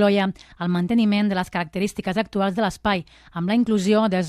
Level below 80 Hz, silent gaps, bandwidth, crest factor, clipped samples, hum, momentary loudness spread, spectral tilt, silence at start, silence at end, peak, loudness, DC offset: -50 dBFS; none; 13.5 kHz; 14 dB; under 0.1%; none; 8 LU; -6.5 dB/octave; 0 s; 0 s; -8 dBFS; -22 LUFS; under 0.1%